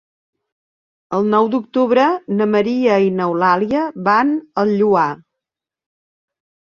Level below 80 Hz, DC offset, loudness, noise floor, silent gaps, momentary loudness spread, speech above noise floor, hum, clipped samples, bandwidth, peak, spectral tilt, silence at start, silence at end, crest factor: -60 dBFS; under 0.1%; -16 LUFS; -85 dBFS; none; 5 LU; 69 dB; none; under 0.1%; 7 kHz; -2 dBFS; -7.5 dB/octave; 1.1 s; 1.6 s; 16 dB